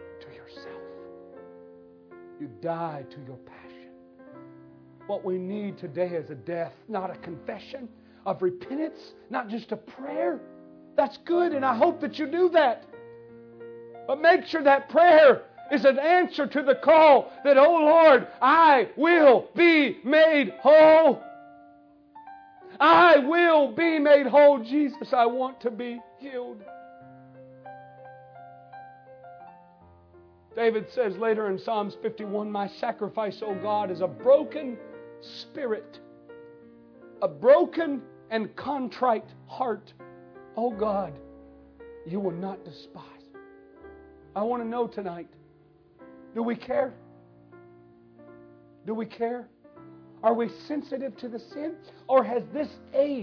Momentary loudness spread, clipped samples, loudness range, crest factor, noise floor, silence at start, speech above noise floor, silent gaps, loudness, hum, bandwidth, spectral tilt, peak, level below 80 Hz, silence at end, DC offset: 21 LU; under 0.1%; 18 LU; 18 dB; -58 dBFS; 0 s; 35 dB; none; -23 LUFS; none; 5.4 kHz; -7 dB/octave; -6 dBFS; -70 dBFS; 0 s; under 0.1%